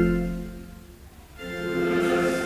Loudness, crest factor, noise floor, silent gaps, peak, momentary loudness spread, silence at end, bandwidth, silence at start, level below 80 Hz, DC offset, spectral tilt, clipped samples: -26 LUFS; 16 dB; -46 dBFS; none; -10 dBFS; 24 LU; 0 s; 16 kHz; 0 s; -40 dBFS; under 0.1%; -6.5 dB/octave; under 0.1%